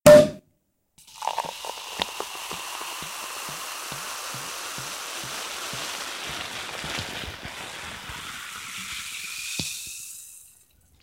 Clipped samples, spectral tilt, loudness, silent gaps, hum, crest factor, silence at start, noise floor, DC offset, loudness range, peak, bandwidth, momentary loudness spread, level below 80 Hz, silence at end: under 0.1%; -3 dB/octave; -28 LUFS; none; none; 22 dB; 0.05 s; -71 dBFS; under 0.1%; 2 LU; -4 dBFS; 16 kHz; 6 LU; -54 dBFS; 0.55 s